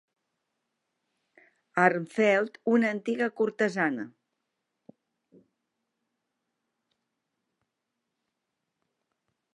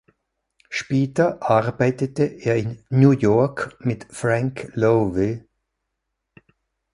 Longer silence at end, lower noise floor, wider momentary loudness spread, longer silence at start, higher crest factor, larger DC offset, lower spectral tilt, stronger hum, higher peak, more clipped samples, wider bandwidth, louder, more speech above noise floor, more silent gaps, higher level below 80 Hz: first, 5.45 s vs 1.55 s; first, -84 dBFS vs -79 dBFS; second, 7 LU vs 10 LU; first, 1.75 s vs 0.7 s; first, 26 dB vs 20 dB; neither; second, -6 dB/octave vs -7.5 dB/octave; neither; second, -8 dBFS vs -2 dBFS; neither; about the same, 11 kHz vs 11.5 kHz; second, -27 LUFS vs -21 LUFS; about the same, 58 dB vs 59 dB; neither; second, -86 dBFS vs -52 dBFS